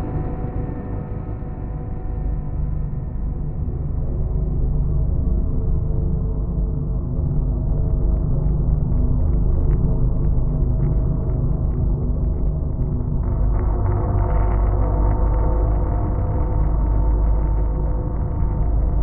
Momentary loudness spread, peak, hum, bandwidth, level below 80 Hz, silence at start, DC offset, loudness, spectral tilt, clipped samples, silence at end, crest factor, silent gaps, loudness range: 7 LU; -6 dBFS; none; 2.3 kHz; -20 dBFS; 0 s; under 0.1%; -23 LUFS; -13 dB/octave; under 0.1%; 0 s; 14 dB; none; 5 LU